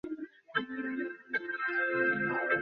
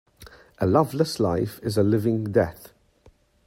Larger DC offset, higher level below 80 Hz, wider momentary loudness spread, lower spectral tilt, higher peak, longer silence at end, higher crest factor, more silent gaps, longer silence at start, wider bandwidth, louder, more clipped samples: neither; second, -74 dBFS vs -54 dBFS; first, 9 LU vs 6 LU; second, -2.5 dB/octave vs -7 dB/octave; second, -16 dBFS vs -4 dBFS; second, 0 s vs 0.8 s; about the same, 16 dB vs 20 dB; neither; second, 0.05 s vs 0.2 s; second, 5.4 kHz vs 16 kHz; second, -33 LUFS vs -23 LUFS; neither